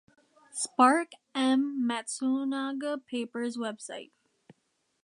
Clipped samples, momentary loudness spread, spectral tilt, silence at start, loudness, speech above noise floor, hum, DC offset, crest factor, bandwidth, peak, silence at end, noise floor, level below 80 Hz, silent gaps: under 0.1%; 15 LU; -2.5 dB/octave; 0.55 s; -29 LUFS; 47 dB; none; under 0.1%; 22 dB; 11 kHz; -8 dBFS; 1 s; -76 dBFS; -86 dBFS; none